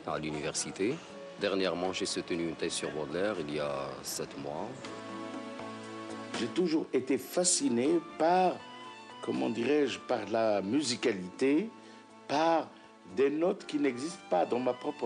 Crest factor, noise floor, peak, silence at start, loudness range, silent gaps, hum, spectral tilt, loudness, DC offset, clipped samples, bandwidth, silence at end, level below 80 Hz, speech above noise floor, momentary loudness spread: 18 dB; -52 dBFS; -16 dBFS; 0 s; 7 LU; none; none; -3.5 dB/octave; -32 LUFS; under 0.1%; under 0.1%; 11 kHz; 0 s; -70 dBFS; 21 dB; 14 LU